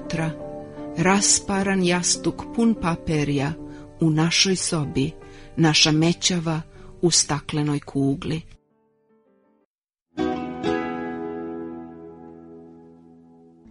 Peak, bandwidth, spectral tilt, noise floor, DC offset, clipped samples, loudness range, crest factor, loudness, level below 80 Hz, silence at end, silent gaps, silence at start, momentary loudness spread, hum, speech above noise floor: -4 dBFS; 11 kHz; -3.5 dB/octave; -76 dBFS; under 0.1%; under 0.1%; 10 LU; 20 dB; -22 LUFS; -48 dBFS; 0.8 s; 9.65-9.82 s, 10.02-10.06 s; 0 s; 18 LU; none; 55 dB